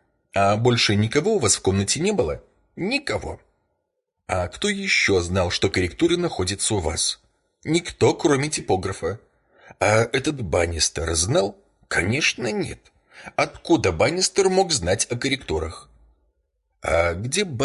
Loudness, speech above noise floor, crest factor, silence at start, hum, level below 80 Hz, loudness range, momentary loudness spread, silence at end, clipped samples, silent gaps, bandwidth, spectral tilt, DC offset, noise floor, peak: -22 LUFS; 55 dB; 16 dB; 0.35 s; none; -40 dBFS; 2 LU; 10 LU; 0 s; under 0.1%; none; 11.5 kHz; -4 dB/octave; under 0.1%; -77 dBFS; -6 dBFS